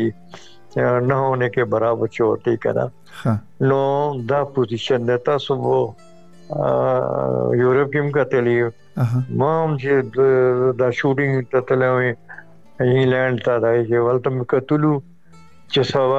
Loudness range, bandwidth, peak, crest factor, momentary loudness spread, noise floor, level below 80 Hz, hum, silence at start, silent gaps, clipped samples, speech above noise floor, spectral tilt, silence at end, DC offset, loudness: 2 LU; 8 kHz; -4 dBFS; 14 dB; 6 LU; -49 dBFS; -56 dBFS; none; 0 s; none; under 0.1%; 31 dB; -8 dB/octave; 0 s; 0.4%; -19 LUFS